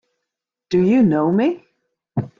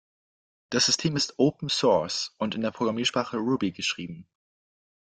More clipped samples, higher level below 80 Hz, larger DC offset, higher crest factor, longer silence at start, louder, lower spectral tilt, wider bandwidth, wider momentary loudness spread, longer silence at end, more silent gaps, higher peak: neither; first, -58 dBFS vs -64 dBFS; neither; second, 12 dB vs 18 dB; about the same, 0.7 s vs 0.7 s; first, -18 LUFS vs -26 LUFS; first, -9 dB/octave vs -3.5 dB/octave; second, 7.2 kHz vs 11 kHz; first, 13 LU vs 8 LU; second, 0.15 s vs 0.9 s; neither; first, -6 dBFS vs -10 dBFS